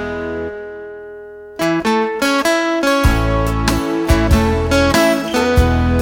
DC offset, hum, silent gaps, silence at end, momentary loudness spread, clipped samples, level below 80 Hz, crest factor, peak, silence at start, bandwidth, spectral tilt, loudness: under 0.1%; none; none; 0 s; 17 LU; under 0.1%; -22 dBFS; 14 dB; 0 dBFS; 0 s; 17 kHz; -5.5 dB/octave; -15 LUFS